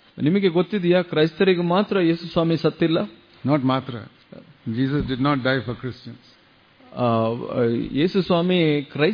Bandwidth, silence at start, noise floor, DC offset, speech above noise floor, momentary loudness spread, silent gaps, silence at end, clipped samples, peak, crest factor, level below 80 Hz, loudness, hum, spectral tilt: 5.2 kHz; 0.15 s; -54 dBFS; under 0.1%; 34 dB; 13 LU; none; 0 s; under 0.1%; -6 dBFS; 16 dB; -50 dBFS; -21 LUFS; none; -9 dB/octave